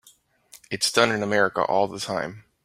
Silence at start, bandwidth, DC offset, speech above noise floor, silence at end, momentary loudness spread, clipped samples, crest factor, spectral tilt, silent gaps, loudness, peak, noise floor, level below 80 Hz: 0.55 s; 16 kHz; under 0.1%; 35 dB; 0.25 s; 11 LU; under 0.1%; 22 dB; -3 dB/octave; none; -23 LUFS; -2 dBFS; -58 dBFS; -62 dBFS